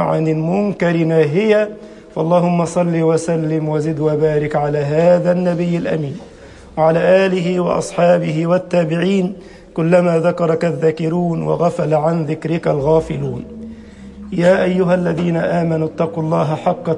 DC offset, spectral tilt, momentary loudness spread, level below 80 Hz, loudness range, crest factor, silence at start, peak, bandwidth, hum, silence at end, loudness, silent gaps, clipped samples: under 0.1%; -7.5 dB/octave; 10 LU; -46 dBFS; 2 LU; 14 dB; 0 s; -2 dBFS; 10.5 kHz; none; 0 s; -16 LUFS; none; under 0.1%